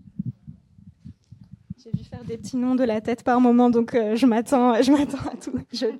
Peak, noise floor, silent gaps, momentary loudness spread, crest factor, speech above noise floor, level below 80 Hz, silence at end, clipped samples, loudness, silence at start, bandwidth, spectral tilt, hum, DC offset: -6 dBFS; -51 dBFS; none; 17 LU; 16 dB; 30 dB; -56 dBFS; 0 s; under 0.1%; -21 LUFS; 0.2 s; 12 kHz; -6 dB/octave; none; under 0.1%